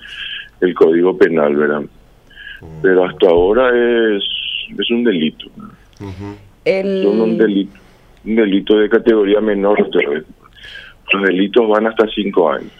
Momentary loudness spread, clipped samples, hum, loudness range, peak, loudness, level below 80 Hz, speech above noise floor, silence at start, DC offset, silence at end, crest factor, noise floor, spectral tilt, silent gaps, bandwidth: 20 LU; under 0.1%; none; 4 LU; 0 dBFS; -14 LUFS; -44 dBFS; 25 dB; 0 s; under 0.1%; 0.1 s; 14 dB; -38 dBFS; -7 dB/octave; none; 6 kHz